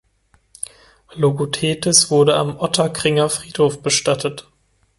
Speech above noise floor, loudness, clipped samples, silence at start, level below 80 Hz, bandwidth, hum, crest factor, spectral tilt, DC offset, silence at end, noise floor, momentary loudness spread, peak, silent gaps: 44 dB; -17 LUFS; under 0.1%; 1.15 s; -54 dBFS; 12 kHz; none; 20 dB; -3.5 dB/octave; under 0.1%; 0.6 s; -61 dBFS; 18 LU; 0 dBFS; none